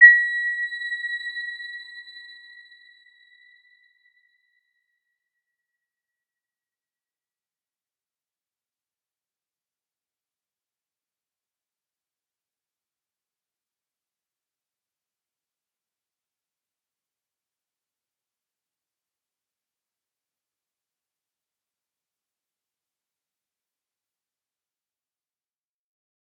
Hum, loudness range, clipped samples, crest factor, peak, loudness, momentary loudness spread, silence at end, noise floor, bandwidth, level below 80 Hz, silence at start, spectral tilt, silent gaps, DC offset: none; 23 LU; under 0.1%; 30 dB; -2 dBFS; -21 LUFS; 23 LU; 24 s; under -90 dBFS; 8.4 kHz; under -90 dBFS; 0 s; 5.5 dB/octave; none; under 0.1%